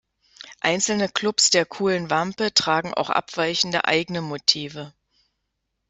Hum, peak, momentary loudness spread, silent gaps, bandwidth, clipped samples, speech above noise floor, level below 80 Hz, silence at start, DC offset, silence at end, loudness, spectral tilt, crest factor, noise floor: none; -2 dBFS; 8 LU; none; 8.4 kHz; under 0.1%; 55 dB; -62 dBFS; 0.45 s; under 0.1%; 1 s; -21 LUFS; -2.5 dB/octave; 22 dB; -77 dBFS